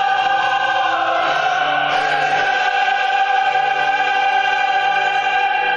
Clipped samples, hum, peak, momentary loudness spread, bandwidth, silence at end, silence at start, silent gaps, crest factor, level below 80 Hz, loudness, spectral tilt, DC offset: under 0.1%; none; -6 dBFS; 1 LU; 7.6 kHz; 0 s; 0 s; none; 10 dB; -60 dBFS; -16 LUFS; -1.5 dB/octave; under 0.1%